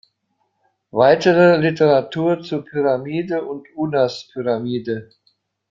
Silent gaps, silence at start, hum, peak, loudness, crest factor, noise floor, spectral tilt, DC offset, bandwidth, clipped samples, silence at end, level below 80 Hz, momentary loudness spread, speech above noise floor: none; 0.95 s; none; -2 dBFS; -18 LUFS; 16 dB; -70 dBFS; -7 dB/octave; under 0.1%; 7.4 kHz; under 0.1%; 0.65 s; -60 dBFS; 13 LU; 52 dB